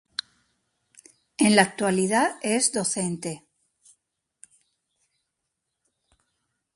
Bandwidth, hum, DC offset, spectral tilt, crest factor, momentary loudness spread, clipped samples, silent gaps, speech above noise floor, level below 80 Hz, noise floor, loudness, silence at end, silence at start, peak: 11.5 kHz; none; under 0.1%; -3.5 dB/octave; 24 dB; 16 LU; under 0.1%; none; 58 dB; -70 dBFS; -81 dBFS; -23 LUFS; 3.4 s; 1.4 s; -4 dBFS